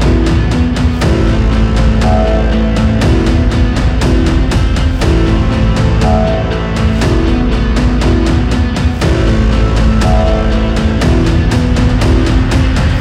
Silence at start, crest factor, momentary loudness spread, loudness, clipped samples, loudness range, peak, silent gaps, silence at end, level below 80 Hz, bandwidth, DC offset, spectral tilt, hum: 0 s; 8 dB; 2 LU; -12 LUFS; under 0.1%; 1 LU; 0 dBFS; none; 0 s; -12 dBFS; 11 kHz; under 0.1%; -7 dB/octave; none